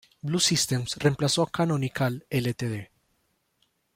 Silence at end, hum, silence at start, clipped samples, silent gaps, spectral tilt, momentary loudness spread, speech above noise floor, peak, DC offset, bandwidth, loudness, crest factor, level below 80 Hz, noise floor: 1.1 s; none; 0.25 s; under 0.1%; none; -4 dB/octave; 9 LU; 46 dB; -8 dBFS; under 0.1%; 16.5 kHz; -26 LUFS; 18 dB; -60 dBFS; -72 dBFS